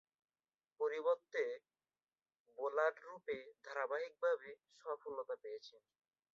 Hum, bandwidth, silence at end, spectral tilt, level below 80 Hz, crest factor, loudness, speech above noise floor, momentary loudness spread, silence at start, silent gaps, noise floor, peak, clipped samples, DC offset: none; 7.4 kHz; 0.55 s; 0 dB/octave; under -90 dBFS; 22 dB; -42 LUFS; over 48 dB; 15 LU; 0.8 s; 2.40-2.45 s; under -90 dBFS; -22 dBFS; under 0.1%; under 0.1%